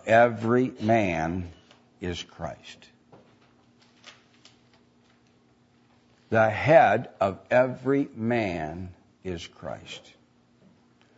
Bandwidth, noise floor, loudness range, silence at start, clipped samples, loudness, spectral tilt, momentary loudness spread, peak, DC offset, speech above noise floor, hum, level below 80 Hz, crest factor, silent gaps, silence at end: 8 kHz; -62 dBFS; 17 LU; 0.05 s; under 0.1%; -25 LUFS; -6.5 dB/octave; 22 LU; -4 dBFS; under 0.1%; 37 dB; none; -58 dBFS; 22 dB; none; 1.2 s